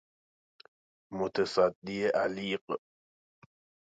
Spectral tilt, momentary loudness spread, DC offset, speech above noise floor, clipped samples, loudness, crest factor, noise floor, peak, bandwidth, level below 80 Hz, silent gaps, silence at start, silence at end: -5.5 dB/octave; 12 LU; under 0.1%; over 59 dB; under 0.1%; -31 LUFS; 20 dB; under -90 dBFS; -14 dBFS; 9.2 kHz; -70 dBFS; 1.75-1.82 s, 2.61-2.67 s; 1.1 s; 1.05 s